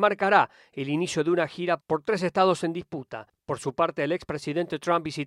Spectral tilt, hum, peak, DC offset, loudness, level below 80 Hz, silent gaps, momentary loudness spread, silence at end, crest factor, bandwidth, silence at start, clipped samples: -5.5 dB/octave; none; -6 dBFS; under 0.1%; -26 LUFS; -64 dBFS; none; 13 LU; 0 s; 20 dB; 12.5 kHz; 0 s; under 0.1%